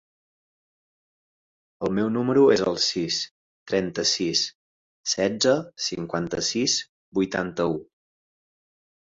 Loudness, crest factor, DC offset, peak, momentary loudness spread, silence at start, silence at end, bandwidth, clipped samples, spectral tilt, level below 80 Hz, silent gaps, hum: -24 LUFS; 20 dB; under 0.1%; -6 dBFS; 10 LU; 1.8 s; 1.35 s; 7.8 kHz; under 0.1%; -3.5 dB/octave; -60 dBFS; 3.31-3.66 s, 4.55-5.04 s, 6.89-7.12 s; none